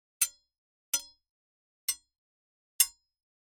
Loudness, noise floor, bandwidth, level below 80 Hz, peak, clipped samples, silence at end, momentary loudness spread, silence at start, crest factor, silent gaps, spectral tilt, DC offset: -31 LUFS; under -90 dBFS; 17 kHz; -76 dBFS; -6 dBFS; under 0.1%; 0.55 s; 8 LU; 0.2 s; 30 dB; 0.58-0.93 s, 1.30-1.88 s, 2.18-2.79 s; 4 dB/octave; under 0.1%